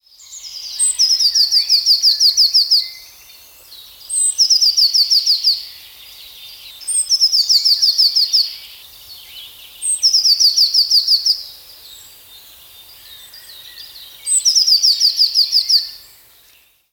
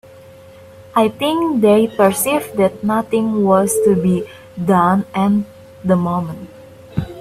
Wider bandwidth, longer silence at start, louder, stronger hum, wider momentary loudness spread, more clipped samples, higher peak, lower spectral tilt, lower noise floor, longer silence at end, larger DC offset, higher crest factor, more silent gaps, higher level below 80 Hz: first, over 20 kHz vs 16 kHz; second, 0.3 s vs 0.8 s; first, -11 LUFS vs -16 LUFS; neither; first, 23 LU vs 13 LU; neither; second, -4 dBFS vs 0 dBFS; second, 5 dB/octave vs -6 dB/octave; first, -52 dBFS vs -40 dBFS; first, 0.95 s vs 0 s; neither; about the same, 14 dB vs 16 dB; neither; second, -62 dBFS vs -50 dBFS